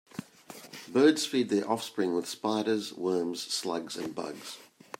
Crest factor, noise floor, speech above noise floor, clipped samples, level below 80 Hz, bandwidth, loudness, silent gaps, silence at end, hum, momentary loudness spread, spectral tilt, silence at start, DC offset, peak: 20 dB; -50 dBFS; 21 dB; under 0.1%; -80 dBFS; 16 kHz; -30 LUFS; none; 0.35 s; none; 21 LU; -4 dB/octave; 0.15 s; under 0.1%; -10 dBFS